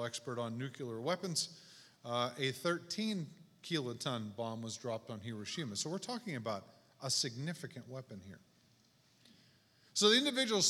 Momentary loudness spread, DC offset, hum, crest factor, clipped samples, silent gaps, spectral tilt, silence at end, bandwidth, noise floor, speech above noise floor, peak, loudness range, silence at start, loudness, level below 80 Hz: 17 LU; under 0.1%; none; 24 dB; under 0.1%; none; -3 dB/octave; 0 s; 17 kHz; -70 dBFS; 32 dB; -16 dBFS; 5 LU; 0 s; -37 LUFS; -84 dBFS